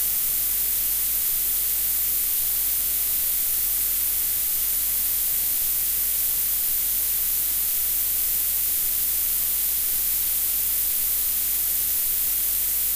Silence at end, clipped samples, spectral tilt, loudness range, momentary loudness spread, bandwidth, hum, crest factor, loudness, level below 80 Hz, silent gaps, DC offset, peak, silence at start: 0 s; under 0.1%; 1 dB/octave; 0 LU; 0 LU; 16 kHz; none; 14 dB; -20 LUFS; -46 dBFS; none; under 0.1%; -10 dBFS; 0 s